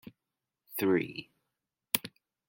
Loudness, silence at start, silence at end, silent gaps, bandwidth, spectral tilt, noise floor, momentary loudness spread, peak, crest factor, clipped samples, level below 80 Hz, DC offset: -32 LUFS; 0.05 s; 0.4 s; none; 17 kHz; -4 dB/octave; -89 dBFS; 15 LU; -6 dBFS; 30 dB; under 0.1%; -76 dBFS; under 0.1%